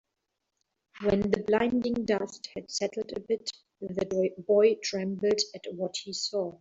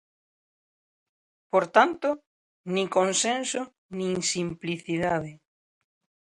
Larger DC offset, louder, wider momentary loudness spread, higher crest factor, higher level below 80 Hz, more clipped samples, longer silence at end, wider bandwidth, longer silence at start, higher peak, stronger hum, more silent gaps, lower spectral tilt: neither; second, -29 LUFS vs -26 LUFS; about the same, 11 LU vs 12 LU; second, 18 dB vs 24 dB; first, -60 dBFS vs -66 dBFS; neither; second, 0.05 s vs 0.95 s; second, 8 kHz vs 11.5 kHz; second, 0.95 s vs 1.55 s; second, -10 dBFS vs -4 dBFS; neither; second, none vs 2.26-2.64 s, 3.78-3.89 s; about the same, -4.5 dB/octave vs -3.5 dB/octave